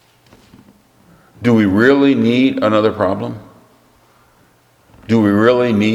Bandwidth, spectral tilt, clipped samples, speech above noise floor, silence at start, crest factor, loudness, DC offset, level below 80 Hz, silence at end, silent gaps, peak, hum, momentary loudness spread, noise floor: 12 kHz; -7.5 dB/octave; under 0.1%; 40 dB; 1.4 s; 16 dB; -13 LUFS; under 0.1%; -56 dBFS; 0 s; none; 0 dBFS; none; 9 LU; -53 dBFS